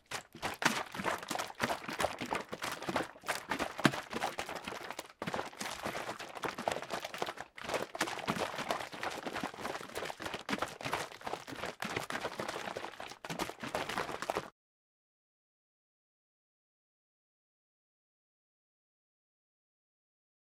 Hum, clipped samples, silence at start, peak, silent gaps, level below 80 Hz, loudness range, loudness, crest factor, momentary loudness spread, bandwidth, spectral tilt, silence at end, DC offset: none; under 0.1%; 0.1 s; -10 dBFS; none; -68 dBFS; 6 LU; -38 LUFS; 32 dB; 8 LU; 17 kHz; -3 dB/octave; 6 s; under 0.1%